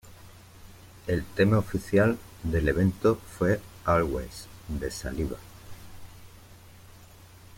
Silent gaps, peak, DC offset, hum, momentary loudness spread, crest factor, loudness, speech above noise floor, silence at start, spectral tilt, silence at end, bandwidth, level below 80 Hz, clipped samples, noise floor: none; -10 dBFS; under 0.1%; none; 19 LU; 20 dB; -27 LUFS; 25 dB; 0.05 s; -7 dB/octave; 0.5 s; 16.5 kHz; -44 dBFS; under 0.1%; -51 dBFS